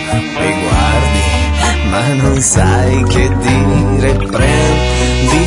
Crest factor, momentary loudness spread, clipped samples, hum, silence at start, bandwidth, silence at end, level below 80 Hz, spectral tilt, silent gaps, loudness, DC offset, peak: 10 dB; 3 LU; under 0.1%; none; 0 s; 11 kHz; 0 s; -18 dBFS; -5 dB/octave; none; -12 LUFS; under 0.1%; 0 dBFS